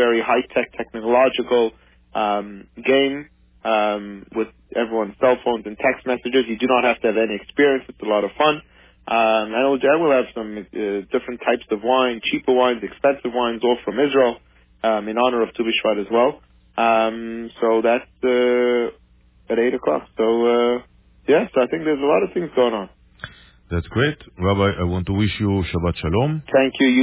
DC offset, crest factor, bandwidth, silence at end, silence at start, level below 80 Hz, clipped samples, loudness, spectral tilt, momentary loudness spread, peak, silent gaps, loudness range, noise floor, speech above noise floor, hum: under 0.1%; 16 dB; 4 kHz; 0 s; 0 s; -42 dBFS; under 0.1%; -20 LUFS; -10 dB/octave; 10 LU; -4 dBFS; none; 2 LU; -40 dBFS; 21 dB; none